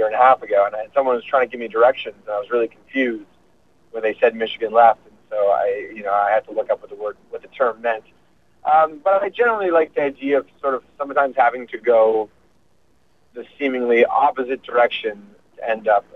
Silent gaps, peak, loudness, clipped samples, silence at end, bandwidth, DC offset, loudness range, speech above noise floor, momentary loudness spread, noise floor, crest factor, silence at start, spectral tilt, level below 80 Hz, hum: none; -2 dBFS; -19 LUFS; under 0.1%; 0.15 s; 5.8 kHz; 0.1%; 3 LU; 43 dB; 13 LU; -62 dBFS; 18 dB; 0 s; -6 dB/octave; -64 dBFS; 60 Hz at -60 dBFS